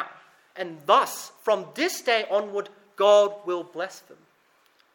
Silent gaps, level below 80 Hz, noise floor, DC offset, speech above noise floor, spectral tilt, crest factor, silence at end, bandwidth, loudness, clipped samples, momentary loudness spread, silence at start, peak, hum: none; -86 dBFS; -63 dBFS; under 0.1%; 39 dB; -2.5 dB/octave; 20 dB; 0.95 s; 17.5 kHz; -24 LUFS; under 0.1%; 17 LU; 0 s; -6 dBFS; none